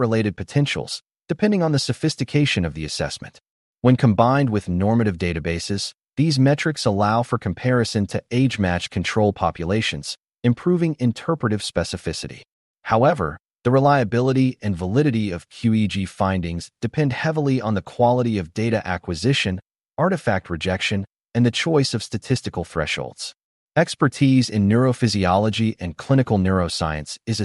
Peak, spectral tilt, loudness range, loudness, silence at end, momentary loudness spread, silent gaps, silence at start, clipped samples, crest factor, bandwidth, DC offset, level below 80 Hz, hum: -4 dBFS; -6 dB/octave; 3 LU; -21 LUFS; 0 s; 9 LU; 3.50-3.74 s, 12.52-12.75 s, 23.44-23.68 s; 0 s; under 0.1%; 18 dB; 11.5 kHz; under 0.1%; -46 dBFS; none